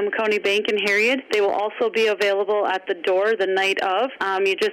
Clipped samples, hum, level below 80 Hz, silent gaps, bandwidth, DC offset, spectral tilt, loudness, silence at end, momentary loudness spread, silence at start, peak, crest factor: under 0.1%; none; -70 dBFS; none; 15.5 kHz; under 0.1%; -3 dB/octave; -20 LUFS; 0 s; 4 LU; 0 s; -12 dBFS; 10 dB